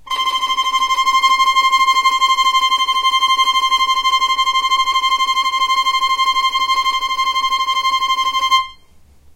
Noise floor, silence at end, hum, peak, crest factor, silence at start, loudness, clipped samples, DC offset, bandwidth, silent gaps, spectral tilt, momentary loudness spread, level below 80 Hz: -46 dBFS; 0.6 s; none; -2 dBFS; 14 dB; 0.05 s; -14 LUFS; under 0.1%; under 0.1%; 16 kHz; none; 2 dB/octave; 4 LU; -50 dBFS